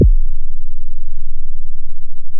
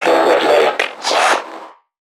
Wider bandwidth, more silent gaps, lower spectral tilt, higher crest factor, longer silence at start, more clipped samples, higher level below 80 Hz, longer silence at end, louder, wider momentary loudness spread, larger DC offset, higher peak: second, 0.6 kHz vs 16.5 kHz; neither; first, -18 dB/octave vs -1.5 dB/octave; second, 4 dB vs 14 dB; about the same, 0 s vs 0 s; neither; first, -14 dBFS vs -68 dBFS; second, 0 s vs 0.45 s; second, -26 LUFS vs -14 LUFS; about the same, 12 LU vs 14 LU; neither; second, -4 dBFS vs 0 dBFS